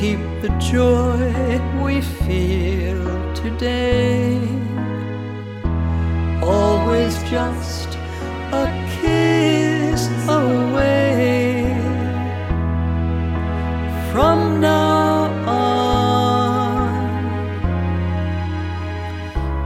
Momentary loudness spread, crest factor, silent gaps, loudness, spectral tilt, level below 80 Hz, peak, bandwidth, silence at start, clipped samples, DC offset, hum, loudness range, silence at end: 9 LU; 16 dB; none; -19 LUFS; -6.5 dB/octave; -28 dBFS; -2 dBFS; 15 kHz; 0 s; under 0.1%; under 0.1%; none; 4 LU; 0 s